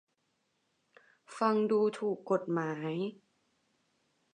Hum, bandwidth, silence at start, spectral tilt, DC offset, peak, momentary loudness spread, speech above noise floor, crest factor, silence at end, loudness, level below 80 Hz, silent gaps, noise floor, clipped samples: none; 10 kHz; 1.3 s; -7 dB/octave; under 0.1%; -14 dBFS; 10 LU; 47 dB; 20 dB; 1.2 s; -32 LUFS; -88 dBFS; none; -79 dBFS; under 0.1%